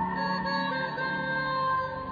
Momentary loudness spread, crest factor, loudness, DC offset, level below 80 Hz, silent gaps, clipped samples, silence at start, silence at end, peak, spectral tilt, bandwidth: 2 LU; 12 dB; -29 LUFS; under 0.1%; -56 dBFS; none; under 0.1%; 0 s; 0 s; -18 dBFS; -6.5 dB/octave; 5 kHz